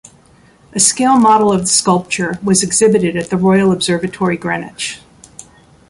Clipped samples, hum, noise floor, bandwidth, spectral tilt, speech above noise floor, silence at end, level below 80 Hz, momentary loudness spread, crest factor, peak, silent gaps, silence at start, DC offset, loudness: under 0.1%; none; -47 dBFS; 11.5 kHz; -4 dB/octave; 34 dB; 0.45 s; -48 dBFS; 12 LU; 14 dB; 0 dBFS; none; 0.75 s; under 0.1%; -13 LUFS